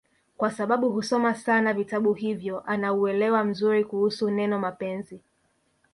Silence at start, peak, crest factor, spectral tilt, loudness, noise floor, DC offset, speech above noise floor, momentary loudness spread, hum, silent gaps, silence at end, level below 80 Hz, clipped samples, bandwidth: 0.4 s; -10 dBFS; 16 dB; -6 dB/octave; -25 LUFS; -69 dBFS; under 0.1%; 45 dB; 7 LU; none; none; 0.75 s; -70 dBFS; under 0.1%; 11.5 kHz